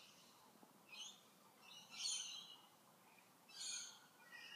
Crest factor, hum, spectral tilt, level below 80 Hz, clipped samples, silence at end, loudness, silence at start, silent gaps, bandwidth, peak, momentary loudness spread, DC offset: 24 dB; none; 1.5 dB/octave; under -90 dBFS; under 0.1%; 0 s; -50 LUFS; 0 s; none; 15.5 kHz; -32 dBFS; 23 LU; under 0.1%